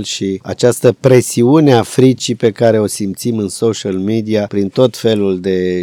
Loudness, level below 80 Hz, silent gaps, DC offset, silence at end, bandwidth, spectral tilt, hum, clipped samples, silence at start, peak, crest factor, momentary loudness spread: -13 LUFS; -54 dBFS; none; under 0.1%; 0 s; 17.5 kHz; -6 dB/octave; none; 0.5%; 0 s; 0 dBFS; 12 dB; 8 LU